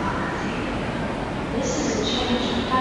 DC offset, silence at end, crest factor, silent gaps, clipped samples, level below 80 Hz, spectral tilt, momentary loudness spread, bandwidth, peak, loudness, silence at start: under 0.1%; 0 s; 16 dB; none; under 0.1%; -38 dBFS; -4.5 dB/octave; 5 LU; 11.5 kHz; -8 dBFS; -25 LUFS; 0 s